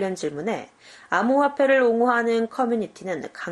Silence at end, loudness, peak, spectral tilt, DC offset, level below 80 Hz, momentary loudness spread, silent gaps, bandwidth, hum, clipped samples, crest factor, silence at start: 0 s; -22 LUFS; -6 dBFS; -5.5 dB/octave; under 0.1%; -70 dBFS; 12 LU; none; 11.5 kHz; none; under 0.1%; 16 dB; 0 s